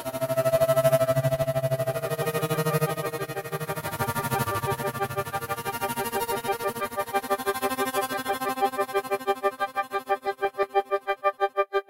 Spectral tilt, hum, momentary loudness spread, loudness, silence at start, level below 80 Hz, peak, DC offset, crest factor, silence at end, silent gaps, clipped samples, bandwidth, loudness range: -5 dB/octave; none; 7 LU; -27 LUFS; 0 s; -58 dBFS; -10 dBFS; under 0.1%; 18 dB; 0.05 s; none; under 0.1%; 16 kHz; 4 LU